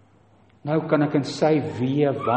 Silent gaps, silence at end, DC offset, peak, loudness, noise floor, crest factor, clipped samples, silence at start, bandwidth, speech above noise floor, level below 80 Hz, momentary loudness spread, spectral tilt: none; 0 s; under 0.1%; -6 dBFS; -22 LUFS; -56 dBFS; 16 dB; under 0.1%; 0.65 s; 8.6 kHz; 35 dB; -66 dBFS; 5 LU; -7 dB/octave